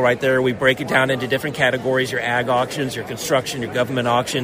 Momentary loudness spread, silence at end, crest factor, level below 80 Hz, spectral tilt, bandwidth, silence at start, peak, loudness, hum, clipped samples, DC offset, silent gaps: 6 LU; 0 s; 16 dB; -52 dBFS; -4.5 dB/octave; 16 kHz; 0 s; -2 dBFS; -19 LUFS; none; under 0.1%; under 0.1%; none